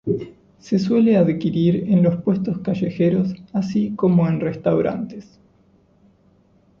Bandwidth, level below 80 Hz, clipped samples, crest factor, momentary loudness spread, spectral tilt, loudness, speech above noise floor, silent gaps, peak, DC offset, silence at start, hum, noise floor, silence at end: 6.8 kHz; -54 dBFS; under 0.1%; 16 dB; 9 LU; -9 dB/octave; -20 LUFS; 38 dB; none; -4 dBFS; under 0.1%; 0.05 s; none; -56 dBFS; 1.6 s